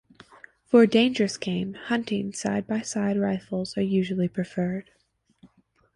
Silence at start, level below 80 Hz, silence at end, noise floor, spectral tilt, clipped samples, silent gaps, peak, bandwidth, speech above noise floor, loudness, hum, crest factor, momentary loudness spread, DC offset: 0.7 s; -62 dBFS; 0.5 s; -61 dBFS; -5.5 dB/octave; under 0.1%; none; -6 dBFS; 11 kHz; 37 dB; -25 LUFS; none; 20 dB; 10 LU; under 0.1%